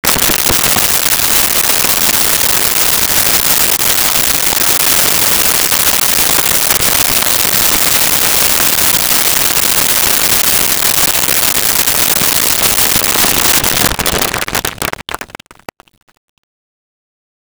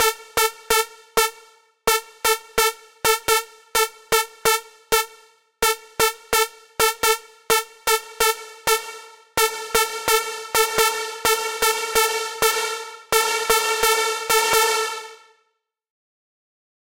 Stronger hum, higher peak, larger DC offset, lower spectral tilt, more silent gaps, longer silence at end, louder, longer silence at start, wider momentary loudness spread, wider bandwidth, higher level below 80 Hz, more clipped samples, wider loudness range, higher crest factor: neither; about the same, 0 dBFS vs 0 dBFS; second, under 0.1% vs 0.1%; about the same, -0.5 dB/octave vs 0.5 dB/octave; neither; first, 2.3 s vs 1.75 s; first, -8 LUFS vs -20 LUFS; about the same, 0.05 s vs 0 s; second, 3 LU vs 6 LU; first, over 20 kHz vs 17 kHz; first, -34 dBFS vs -50 dBFS; neither; first, 5 LU vs 2 LU; second, 12 dB vs 22 dB